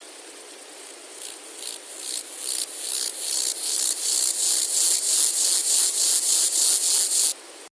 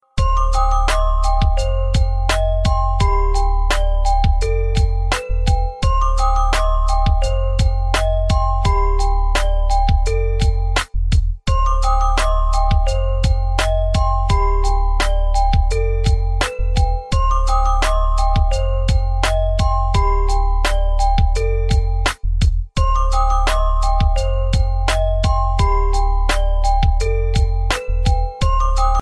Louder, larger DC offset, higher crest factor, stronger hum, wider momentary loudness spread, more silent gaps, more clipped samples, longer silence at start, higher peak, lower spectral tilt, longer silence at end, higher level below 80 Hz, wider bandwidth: about the same, -20 LUFS vs -19 LUFS; neither; first, 20 dB vs 12 dB; neither; first, 22 LU vs 2 LU; neither; neither; second, 0 s vs 0.15 s; about the same, -4 dBFS vs -4 dBFS; second, 4.5 dB/octave vs -5 dB/octave; about the same, 0.05 s vs 0 s; second, -88 dBFS vs -16 dBFS; about the same, 11 kHz vs 11 kHz